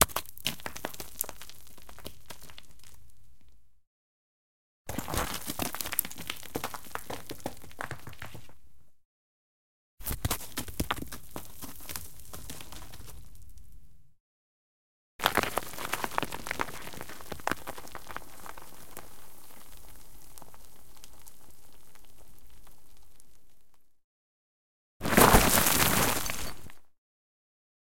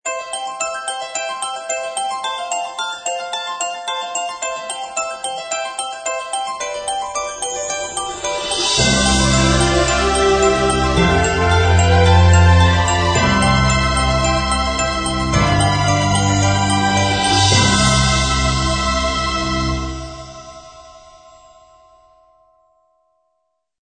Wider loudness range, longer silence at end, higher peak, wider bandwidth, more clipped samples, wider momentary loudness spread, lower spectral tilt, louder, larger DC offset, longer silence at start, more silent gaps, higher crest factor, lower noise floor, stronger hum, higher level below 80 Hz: first, 24 LU vs 9 LU; second, 1 s vs 2.85 s; about the same, 0 dBFS vs 0 dBFS; first, 17 kHz vs 9.4 kHz; neither; first, 27 LU vs 11 LU; about the same, -3 dB/octave vs -4 dB/octave; second, -30 LUFS vs -16 LUFS; first, 1% vs under 0.1%; about the same, 0 s vs 0.05 s; first, 3.87-4.85 s, 9.05-9.98 s, 14.20-15.19 s, 24.04-25.00 s vs none; first, 34 dB vs 16 dB; second, -58 dBFS vs -71 dBFS; neither; second, -46 dBFS vs -28 dBFS